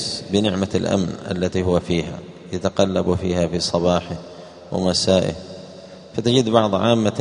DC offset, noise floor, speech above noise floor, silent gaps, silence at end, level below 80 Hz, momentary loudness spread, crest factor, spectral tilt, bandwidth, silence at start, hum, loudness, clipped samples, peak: under 0.1%; -40 dBFS; 20 dB; none; 0 s; -46 dBFS; 17 LU; 20 dB; -5.5 dB/octave; 10.5 kHz; 0 s; none; -20 LUFS; under 0.1%; 0 dBFS